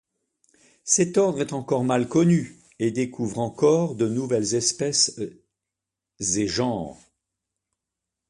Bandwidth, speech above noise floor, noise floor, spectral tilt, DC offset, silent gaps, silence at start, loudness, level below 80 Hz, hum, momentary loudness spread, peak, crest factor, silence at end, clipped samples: 11.5 kHz; 63 dB; -86 dBFS; -4.5 dB/octave; under 0.1%; none; 0.85 s; -23 LUFS; -58 dBFS; none; 10 LU; -6 dBFS; 20 dB; 1.35 s; under 0.1%